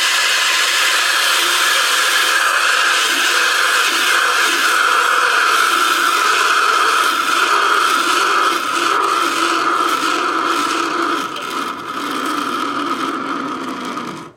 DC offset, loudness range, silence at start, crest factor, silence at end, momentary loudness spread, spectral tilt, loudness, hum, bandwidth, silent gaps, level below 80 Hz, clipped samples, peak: under 0.1%; 6 LU; 0 s; 14 dB; 0.05 s; 9 LU; 0.5 dB/octave; -14 LUFS; none; 16.5 kHz; none; -64 dBFS; under 0.1%; -2 dBFS